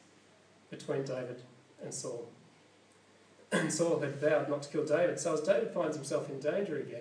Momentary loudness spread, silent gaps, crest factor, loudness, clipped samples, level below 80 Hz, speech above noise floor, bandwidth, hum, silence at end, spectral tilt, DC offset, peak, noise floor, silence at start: 15 LU; none; 18 dB; -34 LUFS; under 0.1%; under -90 dBFS; 30 dB; 10.5 kHz; none; 0 s; -4.5 dB/octave; under 0.1%; -16 dBFS; -63 dBFS; 0.7 s